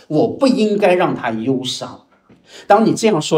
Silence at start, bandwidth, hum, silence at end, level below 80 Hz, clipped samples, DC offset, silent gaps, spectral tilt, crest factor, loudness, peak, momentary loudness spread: 0.1 s; 15.5 kHz; none; 0 s; -62 dBFS; under 0.1%; under 0.1%; none; -5 dB/octave; 16 dB; -16 LUFS; 0 dBFS; 9 LU